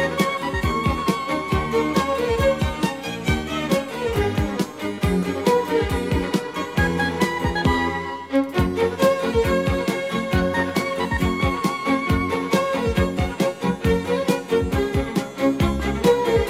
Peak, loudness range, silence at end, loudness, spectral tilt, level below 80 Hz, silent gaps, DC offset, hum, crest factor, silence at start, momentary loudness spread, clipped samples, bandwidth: -4 dBFS; 1 LU; 0 s; -22 LUFS; -6 dB/octave; -34 dBFS; none; under 0.1%; none; 16 dB; 0 s; 4 LU; under 0.1%; 16.5 kHz